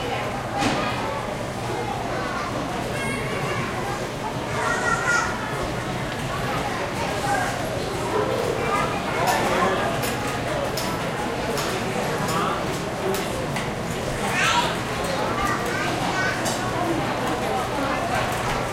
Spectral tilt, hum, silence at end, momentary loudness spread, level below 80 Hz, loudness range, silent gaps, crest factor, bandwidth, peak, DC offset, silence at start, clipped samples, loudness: -4 dB/octave; none; 0 s; 6 LU; -42 dBFS; 3 LU; none; 16 dB; 16.5 kHz; -8 dBFS; under 0.1%; 0 s; under 0.1%; -24 LUFS